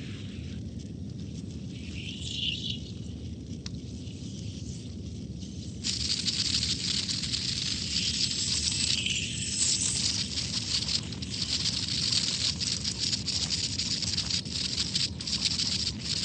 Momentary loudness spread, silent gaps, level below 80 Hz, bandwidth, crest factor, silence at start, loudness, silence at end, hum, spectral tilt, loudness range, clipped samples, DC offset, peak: 14 LU; none; -48 dBFS; 9.4 kHz; 22 dB; 0 s; -28 LUFS; 0 s; none; -2 dB/octave; 9 LU; under 0.1%; under 0.1%; -10 dBFS